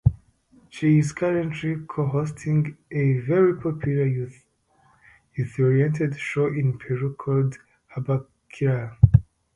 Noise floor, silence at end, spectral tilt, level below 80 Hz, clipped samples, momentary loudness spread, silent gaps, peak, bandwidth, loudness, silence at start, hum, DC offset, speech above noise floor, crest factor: -62 dBFS; 0.35 s; -8.5 dB/octave; -40 dBFS; under 0.1%; 10 LU; none; 0 dBFS; 11 kHz; -23 LUFS; 0.05 s; none; under 0.1%; 39 dB; 22 dB